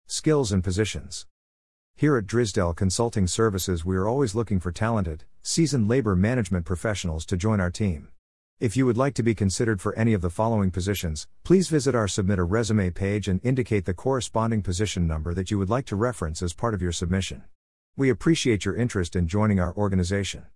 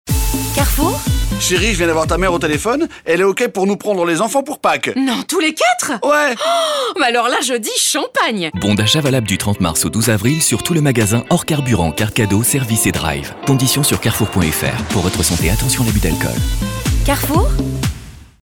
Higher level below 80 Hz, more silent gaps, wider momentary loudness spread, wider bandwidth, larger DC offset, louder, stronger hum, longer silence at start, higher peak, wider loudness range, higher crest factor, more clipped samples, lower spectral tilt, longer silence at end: second, -44 dBFS vs -26 dBFS; first, 1.31-1.94 s, 8.19-8.57 s, 17.55-17.93 s vs none; about the same, 6 LU vs 4 LU; second, 12 kHz vs 18 kHz; first, 0.4% vs under 0.1%; second, -25 LUFS vs -15 LUFS; neither; about the same, 0.1 s vs 0.05 s; second, -8 dBFS vs -2 dBFS; about the same, 2 LU vs 2 LU; about the same, 16 dB vs 14 dB; neither; first, -6 dB/octave vs -4 dB/octave; about the same, 0.15 s vs 0.2 s